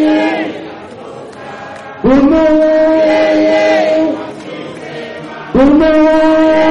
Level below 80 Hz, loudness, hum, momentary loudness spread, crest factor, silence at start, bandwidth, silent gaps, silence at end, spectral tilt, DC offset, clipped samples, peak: -36 dBFS; -10 LUFS; none; 20 LU; 10 dB; 0 s; 8.6 kHz; none; 0 s; -6 dB/octave; under 0.1%; under 0.1%; -2 dBFS